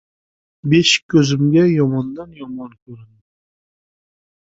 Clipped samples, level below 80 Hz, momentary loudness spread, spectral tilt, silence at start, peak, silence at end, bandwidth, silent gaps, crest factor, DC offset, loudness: under 0.1%; -54 dBFS; 19 LU; -5 dB/octave; 0.65 s; -2 dBFS; 1.35 s; 8 kHz; 1.02-1.09 s, 2.82-2.86 s; 16 dB; under 0.1%; -15 LUFS